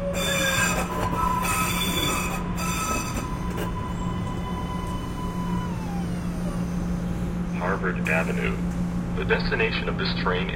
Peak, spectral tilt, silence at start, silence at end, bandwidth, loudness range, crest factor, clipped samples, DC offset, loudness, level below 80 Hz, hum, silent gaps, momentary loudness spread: -6 dBFS; -4.5 dB/octave; 0 s; 0 s; 16.5 kHz; 5 LU; 20 dB; under 0.1%; under 0.1%; -26 LUFS; -36 dBFS; none; none; 7 LU